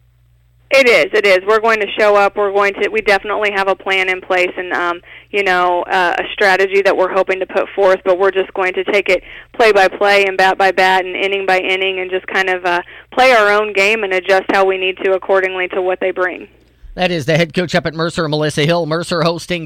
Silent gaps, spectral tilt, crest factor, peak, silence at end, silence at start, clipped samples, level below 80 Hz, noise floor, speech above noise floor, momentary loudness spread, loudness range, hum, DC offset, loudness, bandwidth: none; -4.5 dB/octave; 12 dB; -2 dBFS; 0 s; 0.7 s; under 0.1%; -48 dBFS; -52 dBFS; 38 dB; 7 LU; 4 LU; none; under 0.1%; -14 LUFS; 16 kHz